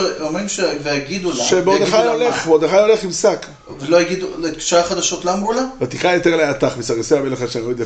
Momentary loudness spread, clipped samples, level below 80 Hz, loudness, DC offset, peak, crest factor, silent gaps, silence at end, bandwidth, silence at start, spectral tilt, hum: 8 LU; under 0.1%; -46 dBFS; -17 LUFS; under 0.1%; -2 dBFS; 14 dB; none; 0 s; 9 kHz; 0 s; -3.5 dB/octave; none